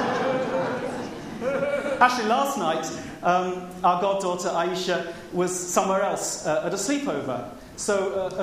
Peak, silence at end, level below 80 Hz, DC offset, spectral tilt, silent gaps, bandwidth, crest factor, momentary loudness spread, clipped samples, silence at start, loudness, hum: -4 dBFS; 0 s; -58 dBFS; under 0.1%; -3.5 dB/octave; none; 15.5 kHz; 20 dB; 9 LU; under 0.1%; 0 s; -25 LUFS; none